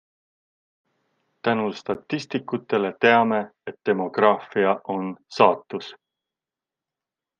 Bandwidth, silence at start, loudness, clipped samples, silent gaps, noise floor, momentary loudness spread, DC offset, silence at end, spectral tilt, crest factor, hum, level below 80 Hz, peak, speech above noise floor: 7.4 kHz; 1.45 s; -23 LUFS; under 0.1%; none; -89 dBFS; 13 LU; under 0.1%; 1.45 s; -6 dB/octave; 22 dB; none; -72 dBFS; -2 dBFS; 67 dB